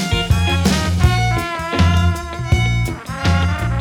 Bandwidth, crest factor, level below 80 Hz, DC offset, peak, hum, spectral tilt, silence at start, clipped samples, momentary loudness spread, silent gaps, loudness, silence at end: 15 kHz; 14 dB; -24 dBFS; under 0.1%; -2 dBFS; none; -5.5 dB/octave; 0 s; under 0.1%; 6 LU; none; -17 LUFS; 0 s